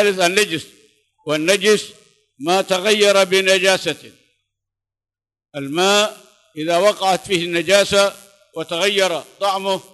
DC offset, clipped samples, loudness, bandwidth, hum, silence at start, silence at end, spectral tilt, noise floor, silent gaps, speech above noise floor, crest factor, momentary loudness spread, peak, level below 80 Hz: under 0.1%; under 0.1%; -17 LUFS; 12.5 kHz; none; 0 s; 0.15 s; -2.5 dB/octave; -84 dBFS; none; 67 dB; 18 dB; 15 LU; 0 dBFS; -62 dBFS